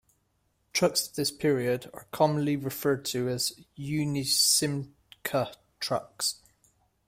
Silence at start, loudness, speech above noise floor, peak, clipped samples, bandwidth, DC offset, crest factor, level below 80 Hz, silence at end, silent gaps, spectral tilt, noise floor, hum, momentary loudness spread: 0.75 s; -28 LUFS; 44 dB; -10 dBFS; under 0.1%; 16 kHz; under 0.1%; 20 dB; -64 dBFS; 0.75 s; none; -3.5 dB/octave; -73 dBFS; none; 14 LU